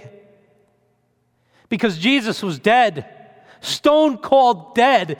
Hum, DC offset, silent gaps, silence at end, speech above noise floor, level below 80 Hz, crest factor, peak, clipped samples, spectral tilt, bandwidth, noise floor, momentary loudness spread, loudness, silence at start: none; under 0.1%; none; 0.05 s; 48 dB; -62 dBFS; 18 dB; -2 dBFS; under 0.1%; -4.5 dB/octave; 17.5 kHz; -65 dBFS; 11 LU; -17 LUFS; 0.05 s